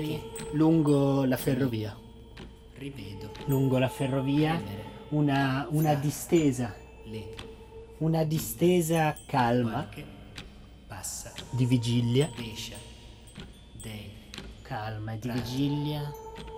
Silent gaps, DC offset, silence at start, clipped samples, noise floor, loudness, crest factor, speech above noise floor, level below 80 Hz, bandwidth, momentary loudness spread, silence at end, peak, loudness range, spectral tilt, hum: none; under 0.1%; 0 s; under 0.1%; -48 dBFS; -28 LUFS; 18 dB; 20 dB; -52 dBFS; over 20 kHz; 21 LU; 0 s; -12 dBFS; 7 LU; -6 dB/octave; none